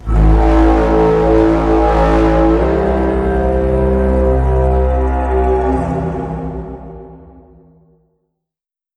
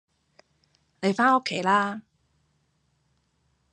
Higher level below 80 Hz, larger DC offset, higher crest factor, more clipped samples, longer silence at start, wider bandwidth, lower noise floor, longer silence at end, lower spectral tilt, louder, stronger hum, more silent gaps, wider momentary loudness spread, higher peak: first, -18 dBFS vs -76 dBFS; neither; second, 12 dB vs 20 dB; neither; second, 0 s vs 1 s; second, 6.6 kHz vs 10 kHz; first, -85 dBFS vs -70 dBFS; about the same, 1.8 s vs 1.7 s; first, -9 dB/octave vs -5 dB/octave; first, -13 LUFS vs -24 LUFS; neither; neither; about the same, 11 LU vs 10 LU; first, 0 dBFS vs -8 dBFS